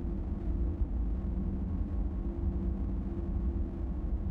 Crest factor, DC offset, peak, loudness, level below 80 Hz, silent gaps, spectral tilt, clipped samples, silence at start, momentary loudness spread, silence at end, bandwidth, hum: 12 dB; under 0.1%; -22 dBFS; -36 LUFS; -34 dBFS; none; -11.5 dB/octave; under 0.1%; 0 s; 2 LU; 0 s; 2.9 kHz; none